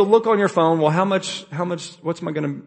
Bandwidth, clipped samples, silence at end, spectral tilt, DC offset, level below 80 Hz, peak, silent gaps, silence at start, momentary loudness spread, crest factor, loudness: 8.8 kHz; under 0.1%; 0.05 s; -6 dB/octave; under 0.1%; -66 dBFS; -2 dBFS; none; 0 s; 11 LU; 18 dB; -20 LUFS